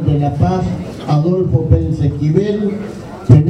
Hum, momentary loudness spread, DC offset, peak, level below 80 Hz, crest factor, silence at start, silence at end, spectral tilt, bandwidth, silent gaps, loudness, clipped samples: none; 10 LU; under 0.1%; 0 dBFS; -30 dBFS; 14 dB; 0 s; 0 s; -9.5 dB/octave; 8.2 kHz; none; -15 LUFS; 0.2%